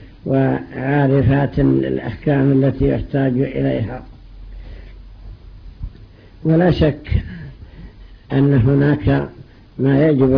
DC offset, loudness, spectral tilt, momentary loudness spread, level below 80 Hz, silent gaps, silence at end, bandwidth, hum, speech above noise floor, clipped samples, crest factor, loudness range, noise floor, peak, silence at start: under 0.1%; -17 LUFS; -11 dB/octave; 21 LU; -32 dBFS; none; 0 s; 5.2 kHz; none; 26 dB; under 0.1%; 14 dB; 7 LU; -41 dBFS; -4 dBFS; 0 s